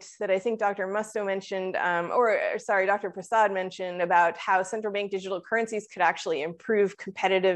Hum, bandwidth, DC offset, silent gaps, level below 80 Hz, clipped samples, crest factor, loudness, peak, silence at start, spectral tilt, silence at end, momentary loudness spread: none; 11.5 kHz; under 0.1%; none; -80 dBFS; under 0.1%; 18 dB; -27 LUFS; -8 dBFS; 0 s; -4 dB/octave; 0 s; 7 LU